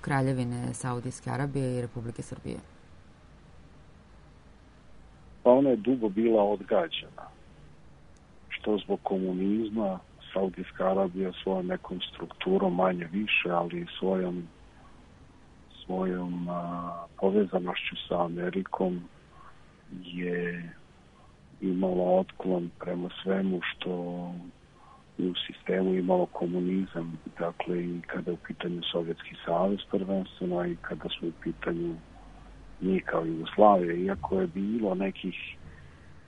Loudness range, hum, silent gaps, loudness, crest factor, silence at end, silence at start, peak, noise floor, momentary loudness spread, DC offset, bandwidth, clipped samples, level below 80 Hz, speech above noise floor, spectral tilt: 7 LU; none; none; -30 LUFS; 24 dB; 0.05 s; 0 s; -6 dBFS; -56 dBFS; 13 LU; under 0.1%; 10.5 kHz; under 0.1%; -58 dBFS; 27 dB; -7 dB/octave